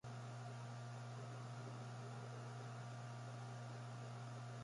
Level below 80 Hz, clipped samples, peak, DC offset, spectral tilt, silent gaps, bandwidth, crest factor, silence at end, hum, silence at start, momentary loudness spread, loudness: -84 dBFS; under 0.1%; -40 dBFS; under 0.1%; -6 dB/octave; none; 11.5 kHz; 10 dB; 0 s; none; 0.05 s; 0 LU; -52 LUFS